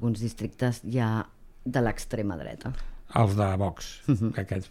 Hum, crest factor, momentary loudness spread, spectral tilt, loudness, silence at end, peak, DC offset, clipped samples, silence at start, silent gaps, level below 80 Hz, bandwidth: none; 18 dB; 12 LU; -7 dB/octave; -29 LUFS; 0 s; -10 dBFS; under 0.1%; under 0.1%; 0 s; none; -44 dBFS; 14 kHz